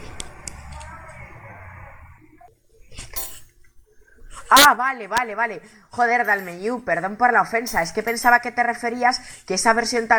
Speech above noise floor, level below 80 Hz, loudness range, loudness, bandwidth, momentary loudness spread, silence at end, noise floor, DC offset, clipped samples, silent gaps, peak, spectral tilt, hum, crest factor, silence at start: 32 dB; -48 dBFS; 18 LU; -19 LUFS; over 20 kHz; 24 LU; 0 s; -51 dBFS; under 0.1%; under 0.1%; none; 0 dBFS; -2 dB/octave; none; 22 dB; 0 s